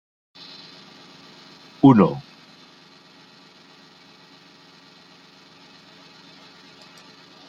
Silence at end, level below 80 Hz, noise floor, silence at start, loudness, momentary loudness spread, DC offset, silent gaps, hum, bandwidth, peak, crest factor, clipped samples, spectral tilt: 5.3 s; -64 dBFS; -50 dBFS; 1.85 s; -17 LUFS; 31 LU; under 0.1%; none; none; 7.2 kHz; -2 dBFS; 24 dB; under 0.1%; -8.5 dB/octave